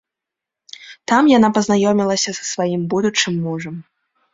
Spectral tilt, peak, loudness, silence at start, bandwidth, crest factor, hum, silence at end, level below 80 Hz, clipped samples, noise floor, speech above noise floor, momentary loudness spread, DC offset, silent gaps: -4.5 dB/octave; -2 dBFS; -17 LUFS; 0.8 s; 7.8 kHz; 18 dB; none; 0.5 s; -58 dBFS; under 0.1%; -84 dBFS; 68 dB; 19 LU; under 0.1%; none